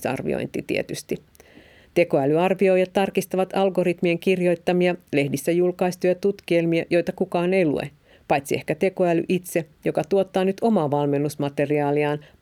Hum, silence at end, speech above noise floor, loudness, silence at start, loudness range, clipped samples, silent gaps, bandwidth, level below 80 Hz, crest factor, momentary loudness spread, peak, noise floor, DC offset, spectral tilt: none; 0.2 s; 29 dB; -22 LUFS; 0 s; 2 LU; under 0.1%; none; 16 kHz; -60 dBFS; 16 dB; 6 LU; -6 dBFS; -50 dBFS; under 0.1%; -6.5 dB/octave